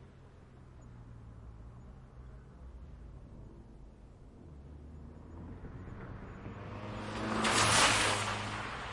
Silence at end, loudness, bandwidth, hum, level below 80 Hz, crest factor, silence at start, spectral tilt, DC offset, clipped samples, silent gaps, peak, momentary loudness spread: 0 s; -30 LUFS; 11.5 kHz; none; -54 dBFS; 24 dB; 0 s; -2.5 dB/octave; under 0.1%; under 0.1%; none; -12 dBFS; 28 LU